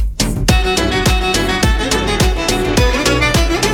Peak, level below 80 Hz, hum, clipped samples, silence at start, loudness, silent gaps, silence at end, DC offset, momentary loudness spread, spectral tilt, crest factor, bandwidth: -2 dBFS; -18 dBFS; none; under 0.1%; 0 s; -14 LUFS; none; 0 s; under 0.1%; 2 LU; -4 dB/octave; 12 dB; 18 kHz